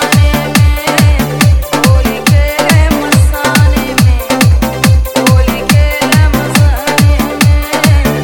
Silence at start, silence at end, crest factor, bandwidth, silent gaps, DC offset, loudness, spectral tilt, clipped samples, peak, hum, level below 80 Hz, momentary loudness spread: 0 s; 0 s; 8 dB; over 20 kHz; none; under 0.1%; -9 LUFS; -5 dB/octave; 0.5%; 0 dBFS; none; -14 dBFS; 1 LU